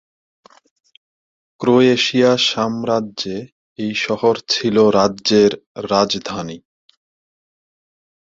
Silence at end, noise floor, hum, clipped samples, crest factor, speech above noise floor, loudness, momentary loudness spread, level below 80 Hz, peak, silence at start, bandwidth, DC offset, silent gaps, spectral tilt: 1.7 s; under -90 dBFS; none; under 0.1%; 18 dB; over 74 dB; -16 LUFS; 14 LU; -56 dBFS; -2 dBFS; 1.6 s; 7.8 kHz; under 0.1%; 3.52-3.76 s, 5.66-5.75 s; -4.5 dB/octave